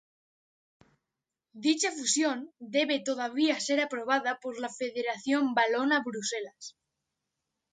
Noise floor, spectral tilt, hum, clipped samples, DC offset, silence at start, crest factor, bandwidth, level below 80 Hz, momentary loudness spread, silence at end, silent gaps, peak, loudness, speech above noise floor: -88 dBFS; -1.5 dB/octave; none; under 0.1%; under 0.1%; 1.55 s; 20 dB; 9.6 kHz; -82 dBFS; 10 LU; 1 s; none; -12 dBFS; -29 LUFS; 59 dB